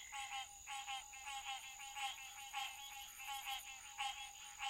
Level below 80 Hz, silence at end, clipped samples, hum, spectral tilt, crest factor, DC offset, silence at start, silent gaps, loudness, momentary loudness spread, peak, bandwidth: -74 dBFS; 0 s; under 0.1%; none; 2.5 dB/octave; 20 dB; under 0.1%; 0 s; none; -47 LUFS; 5 LU; -30 dBFS; 16 kHz